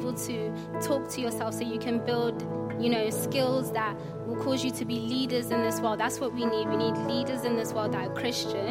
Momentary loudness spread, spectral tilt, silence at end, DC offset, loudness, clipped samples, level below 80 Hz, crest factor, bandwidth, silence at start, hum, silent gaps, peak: 5 LU; -5 dB/octave; 0 s; under 0.1%; -29 LUFS; under 0.1%; -62 dBFS; 16 dB; 16.5 kHz; 0 s; none; none; -14 dBFS